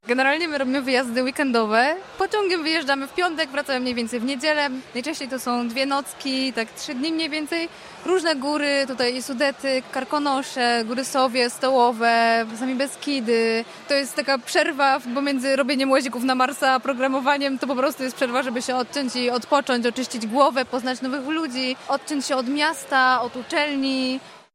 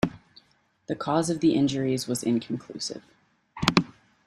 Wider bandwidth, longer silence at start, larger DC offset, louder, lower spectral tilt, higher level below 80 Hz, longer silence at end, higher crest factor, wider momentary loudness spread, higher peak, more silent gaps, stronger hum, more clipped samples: first, 16 kHz vs 13.5 kHz; about the same, 0.05 s vs 0.05 s; neither; first, -22 LUFS vs -26 LUFS; second, -2.5 dB/octave vs -5 dB/octave; second, -68 dBFS vs -56 dBFS; second, 0.15 s vs 0.35 s; second, 18 dB vs 26 dB; second, 6 LU vs 13 LU; about the same, -4 dBFS vs -2 dBFS; neither; neither; neither